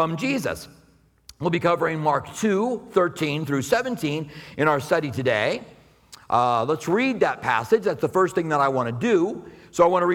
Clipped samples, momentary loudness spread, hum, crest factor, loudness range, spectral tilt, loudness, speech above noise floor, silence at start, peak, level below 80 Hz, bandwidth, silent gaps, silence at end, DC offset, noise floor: under 0.1%; 7 LU; none; 18 dB; 3 LU; -5.5 dB/octave; -23 LUFS; 30 dB; 0 s; -4 dBFS; -58 dBFS; 18 kHz; none; 0 s; under 0.1%; -52 dBFS